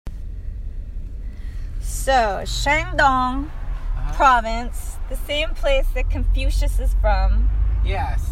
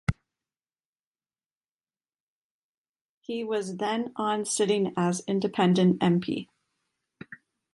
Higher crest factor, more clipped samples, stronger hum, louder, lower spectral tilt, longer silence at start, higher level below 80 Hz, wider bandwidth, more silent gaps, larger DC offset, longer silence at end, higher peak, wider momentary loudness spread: about the same, 18 dB vs 18 dB; neither; neither; first, -21 LUFS vs -27 LUFS; about the same, -4.5 dB/octave vs -5.5 dB/octave; about the same, 0.05 s vs 0.1 s; first, -22 dBFS vs -54 dBFS; first, 14.5 kHz vs 11.5 kHz; second, none vs 0.85-0.93 s, 1.06-1.14 s, 1.46-1.61 s, 1.71-1.75 s, 2.20-2.94 s, 3.01-3.22 s; neither; second, 0 s vs 0.4 s; first, -2 dBFS vs -10 dBFS; second, 17 LU vs 23 LU